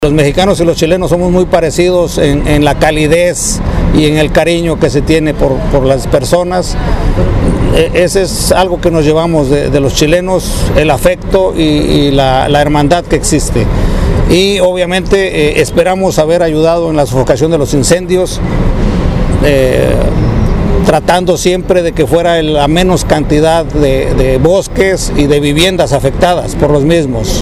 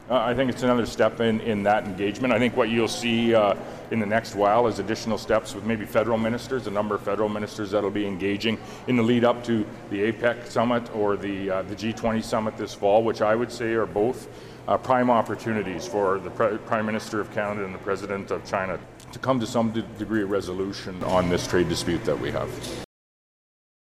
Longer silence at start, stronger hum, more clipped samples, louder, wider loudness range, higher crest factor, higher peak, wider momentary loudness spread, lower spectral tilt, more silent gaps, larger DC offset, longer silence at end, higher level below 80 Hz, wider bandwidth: about the same, 0 s vs 0 s; neither; first, 0.3% vs under 0.1%; first, -10 LUFS vs -25 LUFS; second, 1 LU vs 4 LU; second, 8 dB vs 16 dB; first, 0 dBFS vs -8 dBFS; second, 4 LU vs 9 LU; about the same, -5.5 dB/octave vs -5.5 dB/octave; neither; first, 0.2% vs under 0.1%; second, 0 s vs 0.95 s; first, -18 dBFS vs -50 dBFS; about the same, 15 kHz vs 15 kHz